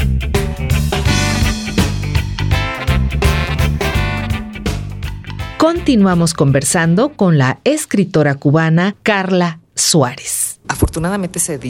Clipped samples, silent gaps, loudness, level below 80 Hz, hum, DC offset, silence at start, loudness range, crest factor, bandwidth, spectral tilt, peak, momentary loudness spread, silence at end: under 0.1%; none; -15 LUFS; -24 dBFS; none; under 0.1%; 0 s; 4 LU; 14 dB; 19 kHz; -5 dB/octave; 0 dBFS; 8 LU; 0 s